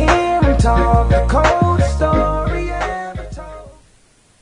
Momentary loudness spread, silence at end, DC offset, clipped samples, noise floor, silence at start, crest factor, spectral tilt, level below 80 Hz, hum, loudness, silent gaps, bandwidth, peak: 16 LU; 0.7 s; under 0.1%; under 0.1%; -52 dBFS; 0 s; 16 dB; -6.5 dB/octave; -20 dBFS; none; -15 LUFS; none; 10.5 kHz; 0 dBFS